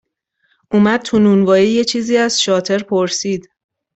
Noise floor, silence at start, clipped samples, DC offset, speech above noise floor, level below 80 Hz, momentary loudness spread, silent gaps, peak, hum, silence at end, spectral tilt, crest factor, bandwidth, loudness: -64 dBFS; 0.7 s; under 0.1%; under 0.1%; 50 dB; -54 dBFS; 7 LU; none; -2 dBFS; none; 0.55 s; -4.5 dB/octave; 14 dB; 8.2 kHz; -14 LUFS